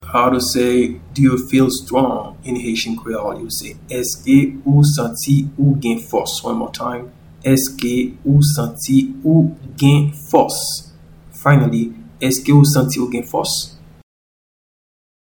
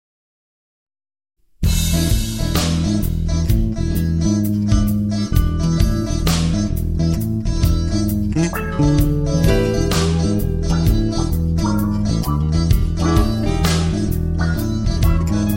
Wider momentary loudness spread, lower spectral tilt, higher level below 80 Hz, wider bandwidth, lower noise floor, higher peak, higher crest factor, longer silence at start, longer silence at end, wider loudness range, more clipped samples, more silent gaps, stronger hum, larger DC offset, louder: first, 11 LU vs 3 LU; about the same, -5.5 dB/octave vs -6 dB/octave; second, -44 dBFS vs -22 dBFS; first, 19.5 kHz vs 16.5 kHz; second, -41 dBFS vs under -90 dBFS; about the same, 0 dBFS vs -2 dBFS; about the same, 16 dB vs 14 dB; second, 0 s vs 1.6 s; first, 1.65 s vs 0 s; about the same, 3 LU vs 2 LU; neither; neither; neither; neither; about the same, -16 LUFS vs -18 LUFS